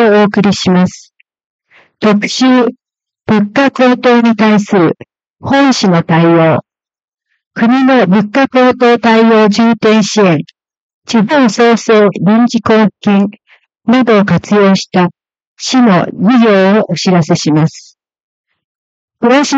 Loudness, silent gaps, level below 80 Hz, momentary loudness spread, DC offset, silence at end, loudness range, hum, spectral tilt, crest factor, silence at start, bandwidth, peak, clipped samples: -9 LUFS; 1.46-1.59 s, 5.30-5.34 s, 7.04-7.08 s, 7.46-7.51 s, 10.80-11.02 s, 15.47-15.56 s, 18.20-18.44 s, 18.64-19.08 s; -54 dBFS; 7 LU; under 0.1%; 0 s; 3 LU; none; -6 dB/octave; 10 dB; 0 s; 8 kHz; 0 dBFS; under 0.1%